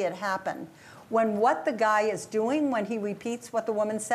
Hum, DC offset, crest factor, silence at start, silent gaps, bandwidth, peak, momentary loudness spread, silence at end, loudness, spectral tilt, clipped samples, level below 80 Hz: none; under 0.1%; 16 dB; 0 s; none; 15 kHz; -12 dBFS; 9 LU; 0 s; -28 LUFS; -4.5 dB/octave; under 0.1%; -76 dBFS